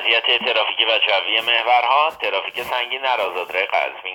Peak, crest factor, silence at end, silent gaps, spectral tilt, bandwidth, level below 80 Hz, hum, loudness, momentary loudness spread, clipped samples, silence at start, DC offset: -2 dBFS; 18 dB; 0 s; none; -1.5 dB/octave; 19.5 kHz; -68 dBFS; none; -18 LUFS; 7 LU; under 0.1%; 0 s; under 0.1%